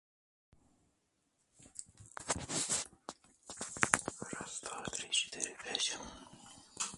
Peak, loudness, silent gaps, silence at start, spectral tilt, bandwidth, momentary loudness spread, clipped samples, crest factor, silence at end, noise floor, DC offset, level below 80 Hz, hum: -4 dBFS; -37 LUFS; none; 1.6 s; -1 dB/octave; 12 kHz; 19 LU; under 0.1%; 38 dB; 0 s; -79 dBFS; under 0.1%; -66 dBFS; none